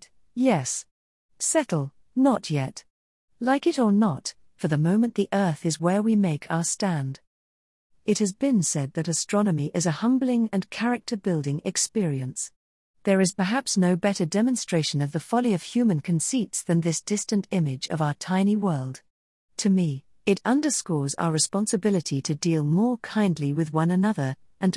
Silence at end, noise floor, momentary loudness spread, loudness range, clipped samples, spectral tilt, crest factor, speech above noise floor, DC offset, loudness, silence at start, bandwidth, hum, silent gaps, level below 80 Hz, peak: 0 s; under -90 dBFS; 7 LU; 2 LU; under 0.1%; -5 dB/octave; 16 dB; over 66 dB; under 0.1%; -25 LUFS; 0.35 s; 12 kHz; none; 0.91-1.29 s, 2.90-3.28 s, 7.27-7.90 s, 12.56-12.94 s, 19.10-19.48 s; -68 dBFS; -10 dBFS